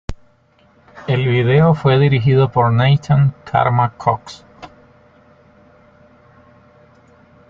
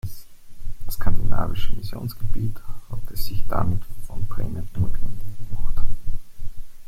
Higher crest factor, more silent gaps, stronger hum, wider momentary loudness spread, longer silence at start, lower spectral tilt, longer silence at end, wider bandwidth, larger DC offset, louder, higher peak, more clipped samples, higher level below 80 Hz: about the same, 16 dB vs 14 dB; neither; neither; about the same, 14 LU vs 14 LU; about the same, 0.1 s vs 0.05 s; first, -8.5 dB/octave vs -6.5 dB/octave; first, 2.85 s vs 0.05 s; second, 7.2 kHz vs 14 kHz; neither; first, -15 LUFS vs -31 LUFS; about the same, -2 dBFS vs -2 dBFS; neither; second, -44 dBFS vs -26 dBFS